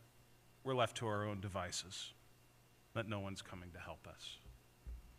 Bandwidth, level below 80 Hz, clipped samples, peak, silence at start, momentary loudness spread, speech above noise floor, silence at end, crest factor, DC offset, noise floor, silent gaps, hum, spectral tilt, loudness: 15.5 kHz; -64 dBFS; under 0.1%; -20 dBFS; 0 s; 18 LU; 24 dB; 0 s; 24 dB; under 0.1%; -68 dBFS; none; none; -4.5 dB/octave; -44 LUFS